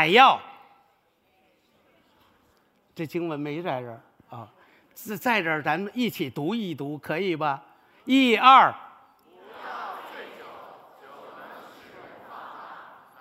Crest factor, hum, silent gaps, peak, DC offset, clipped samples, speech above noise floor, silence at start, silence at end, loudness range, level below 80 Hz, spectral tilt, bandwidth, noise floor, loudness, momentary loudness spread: 26 dB; none; none; 0 dBFS; under 0.1%; under 0.1%; 44 dB; 0 s; 0.35 s; 20 LU; -78 dBFS; -5 dB/octave; 16 kHz; -66 dBFS; -23 LUFS; 28 LU